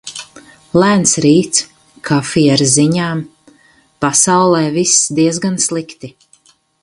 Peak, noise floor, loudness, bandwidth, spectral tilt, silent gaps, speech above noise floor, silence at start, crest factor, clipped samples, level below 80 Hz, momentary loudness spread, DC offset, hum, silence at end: 0 dBFS; -51 dBFS; -12 LUFS; 11.5 kHz; -4 dB/octave; none; 39 dB; 0.05 s; 14 dB; under 0.1%; -52 dBFS; 19 LU; under 0.1%; none; 0.75 s